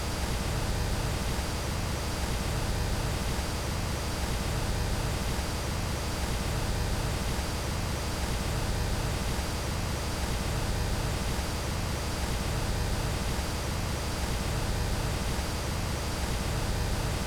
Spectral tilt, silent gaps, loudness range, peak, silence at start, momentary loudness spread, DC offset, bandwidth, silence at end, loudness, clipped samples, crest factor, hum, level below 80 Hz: -4.5 dB/octave; none; 0 LU; -18 dBFS; 0 s; 1 LU; under 0.1%; 18.5 kHz; 0 s; -32 LUFS; under 0.1%; 12 dB; none; -34 dBFS